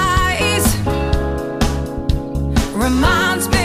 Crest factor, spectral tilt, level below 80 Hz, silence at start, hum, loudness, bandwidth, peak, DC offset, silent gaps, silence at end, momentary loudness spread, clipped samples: 14 dB; -4.5 dB/octave; -22 dBFS; 0 s; none; -17 LUFS; 15.5 kHz; -4 dBFS; under 0.1%; none; 0 s; 7 LU; under 0.1%